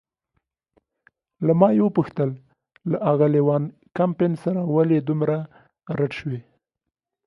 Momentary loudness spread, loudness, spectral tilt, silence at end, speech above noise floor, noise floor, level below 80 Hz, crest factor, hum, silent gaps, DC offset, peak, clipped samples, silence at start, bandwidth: 14 LU; -22 LUFS; -10.5 dB/octave; 0.85 s; 64 dB; -84 dBFS; -64 dBFS; 22 dB; none; none; under 0.1%; -2 dBFS; under 0.1%; 1.4 s; 6 kHz